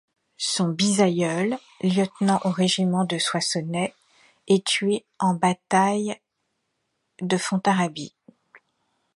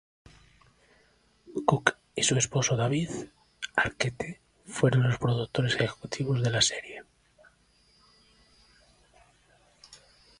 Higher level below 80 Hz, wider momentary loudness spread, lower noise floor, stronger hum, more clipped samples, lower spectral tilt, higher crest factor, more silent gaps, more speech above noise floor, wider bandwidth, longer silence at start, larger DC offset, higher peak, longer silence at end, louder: second, -70 dBFS vs -58 dBFS; second, 8 LU vs 15 LU; first, -76 dBFS vs -65 dBFS; second, none vs 60 Hz at -50 dBFS; neither; about the same, -4.5 dB/octave vs -4 dB/octave; second, 20 dB vs 28 dB; neither; first, 54 dB vs 38 dB; about the same, 11.5 kHz vs 11.5 kHz; second, 0.4 s vs 1.5 s; neither; second, -6 dBFS vs -2 dBFS; first, 0.6 s vs 0.45 s; first, -23 LUFS vs -28 LUFS